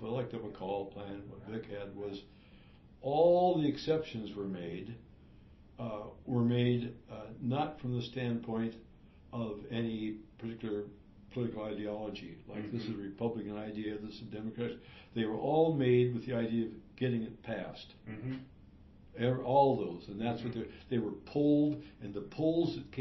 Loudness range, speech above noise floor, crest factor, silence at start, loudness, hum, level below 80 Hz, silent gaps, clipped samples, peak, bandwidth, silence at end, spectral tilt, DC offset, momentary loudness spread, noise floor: 7 LU; 23 dB; 20 dB; 0 s; -35 LUFS; none; -62 dBFS; none; under 0.1%; -16 dBFS; 6 kHz; 0 s; -6.5 dB/octave; under 0.1%; 16 LU; -58 dBFS